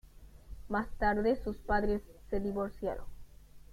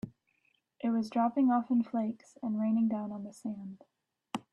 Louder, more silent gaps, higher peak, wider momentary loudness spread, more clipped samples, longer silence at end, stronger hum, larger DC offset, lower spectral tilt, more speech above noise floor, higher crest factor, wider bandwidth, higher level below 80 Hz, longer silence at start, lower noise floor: about the same, -34 LUFS vs -32 LUFS; neither; about the same, -18 dBFS vs -18 dBFS; second, 11 LU vs 15 LU; neither; second, 0 s vs 0.15 s; neither; neither; about the same, -7.5 dB/octave vs -7.5 dB/octave; second, 20 dB vs 44 dB; about the same, 16 dB vs 16 dB; first, 15.5 kHz vs 11 kHz; first, -44 dBFS vs -78 dBFS; about the same, 0.05 s vs 0.05 s; second, -53 dBFS vs -75 dBFS